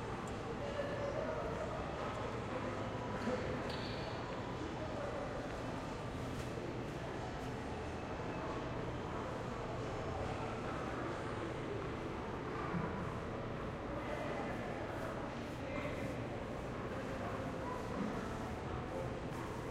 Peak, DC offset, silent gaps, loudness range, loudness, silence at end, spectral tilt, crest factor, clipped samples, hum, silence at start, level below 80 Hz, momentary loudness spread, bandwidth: -26 dBFS; under 0.1%; none; 2 LU; -42 LUFS; 0 s; -6.5 dB/octave; 16 dB; under 0.1%; none; 0 s; -54 dBFS; 3 LU; 15.5 kHz